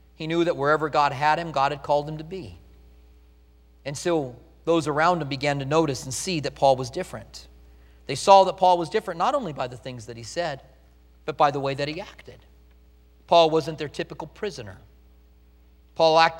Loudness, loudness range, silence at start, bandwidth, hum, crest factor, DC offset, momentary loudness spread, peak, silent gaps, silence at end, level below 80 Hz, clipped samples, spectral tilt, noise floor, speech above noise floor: -23 LUFS; 7 LU; 0.2 s; 16 kHz; none; 24 dB; under 0.1%; 19 LU; -2 dBFS; none; 0 s; -52 dBFS; under 0.1%; -4.5 dB/octave; -54 dBFS; 31 dB